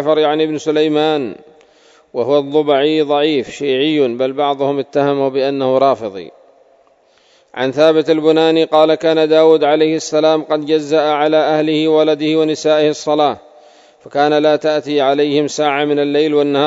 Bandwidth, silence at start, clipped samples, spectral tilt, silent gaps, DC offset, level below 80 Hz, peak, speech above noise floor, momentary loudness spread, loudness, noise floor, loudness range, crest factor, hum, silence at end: 7.8 kHz; 0 s; under 0.1%; -5 dB/octave; none; under 0.1%; -66 dBFS; 0 dBFS; 39 dB; 6 LU; -14 LUFS; -52 dBFS; 4 LU; 14 dB; none; 0 s